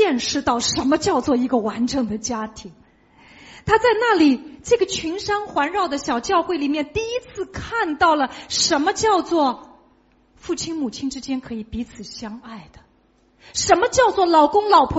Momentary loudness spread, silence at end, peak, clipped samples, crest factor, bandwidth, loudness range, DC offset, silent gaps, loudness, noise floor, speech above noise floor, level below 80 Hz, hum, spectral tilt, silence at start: 16 LU; 0 s; -2 dBFS; under 0.1%; 20 dB; 8 kHz; 9 LU; under 0.1%; none; -20 LUFS; -59 dBFS; 39 dB; -46 dBFS; none; -2.5 dB/octave; 0 s